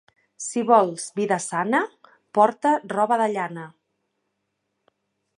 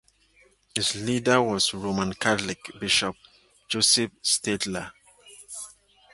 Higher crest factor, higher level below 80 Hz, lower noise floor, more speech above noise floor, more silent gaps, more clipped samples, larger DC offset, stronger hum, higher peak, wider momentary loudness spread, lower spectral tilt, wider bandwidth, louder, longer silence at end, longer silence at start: about the same, 20 dB vs 24 dB; second, -80 dBFS vs -58 dBFS; first, -77 dBFS vs -61 dBFS; first, 55 dB vs 36 dB; neither; neither; neither; neither; about the same, -4 dBFS vs -4 dBFS; second, 14 LU vs 18 LU; first, -4.5 dB/octave vs -2.5 dB/octave; about the same, 11.5 kHz vs 12 kHz; about the same, -22 LUFS vs -24 LUFS; first, 1.7 s vs 0.45 s; second, 0.4 s vs 0.75 s